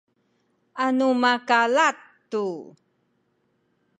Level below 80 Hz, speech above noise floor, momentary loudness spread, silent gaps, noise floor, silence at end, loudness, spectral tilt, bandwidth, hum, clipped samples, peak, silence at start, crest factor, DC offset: -84 dBFS; 48 dB; 18 LU; none; -70 dBFS; 1.3 s; -22 LUFS; -3.5 dB/octave; 9.4 kHz; none; under 0.1%; -6 dBFS; 0.75 s; 20 dB; under 0.1%